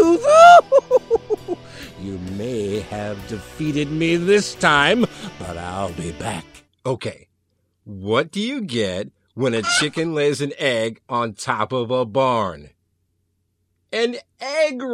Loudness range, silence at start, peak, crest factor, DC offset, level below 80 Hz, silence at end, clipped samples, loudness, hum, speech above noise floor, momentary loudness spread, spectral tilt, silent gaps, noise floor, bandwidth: 6 LU; 0 s; 0 dBFS; 20 dB; under 0.1%; -50 dBFS; 0 s; under 0.1%; -18 LUFS; none; 48 dB; 16 LU; -4.5 dB/octave; none; -69 dBFS; 13.5 kHz